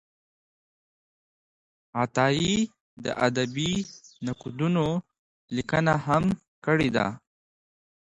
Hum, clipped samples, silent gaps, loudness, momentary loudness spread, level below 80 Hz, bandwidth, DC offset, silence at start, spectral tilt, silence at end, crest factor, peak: none; under 0.1%; 2.81-2.97 s, 5.19-5.48 s, 6.48-6.62 s; -27 LUFS; 11 LU; -56 dBFS; 11 kHz; under 0.1%; 1.95 s; -5.5 dB/octave; 0.8 s; 22 dB; -8 dBFS